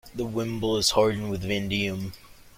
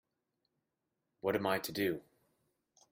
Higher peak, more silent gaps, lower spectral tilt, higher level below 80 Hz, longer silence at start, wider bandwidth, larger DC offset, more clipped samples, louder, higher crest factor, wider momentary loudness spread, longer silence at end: first, -6 dBFS vs -18 dBFS; neither; about the same, -4 dB/octave vs -4.5 dB/octave; first, -48 dBFS vs -76 dBFS; second, 0.05 s vs 1.25 s; about the same, 16.5 kHz vs 16 kHz; neither; neither; first, -26 LUFS vs -36 LUFS; about the same, 20 dB vs 22 dB; first, 10 LU vs 6 LU; second, 0.1 s vs 0.9 s